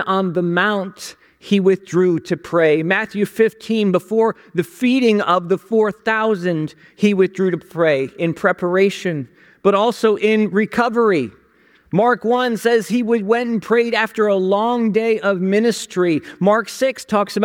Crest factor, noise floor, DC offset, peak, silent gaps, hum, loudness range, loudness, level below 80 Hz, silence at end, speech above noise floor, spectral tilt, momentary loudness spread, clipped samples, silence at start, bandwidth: 14 dB; -54 dBFS; under 0.1%; -2 dBFS; none; none; 1 LU; -17 LUFS; -64 dBFS; 0 s; 37 dB; -6 dB/octave; 6 LU; under 0.1%; 0 s; 17 kHz